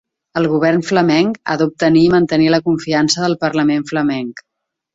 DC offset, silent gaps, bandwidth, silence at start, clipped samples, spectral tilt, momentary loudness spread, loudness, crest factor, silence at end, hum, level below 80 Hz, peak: under 0.1%; none; 8 kHz; 0.35 s; under 0.1%; -5.5 dB/octave; 7 LU; -15 LUFS; 14 dB; 0.55 s; none; -52 dBFS; -2 dBFS